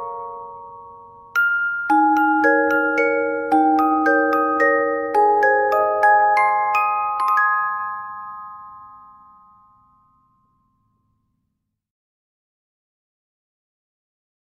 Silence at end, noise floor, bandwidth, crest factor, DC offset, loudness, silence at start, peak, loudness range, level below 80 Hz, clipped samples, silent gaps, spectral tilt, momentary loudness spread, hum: 5.55 s; -76 dBFS; 14 kHz; 16 dB; under 0.1%; -17 LUFS; 0 s; -4 dBFS; 8 LU; -64 dBFS; under 0.1%; none; -5 dB/octave; 18 LU; none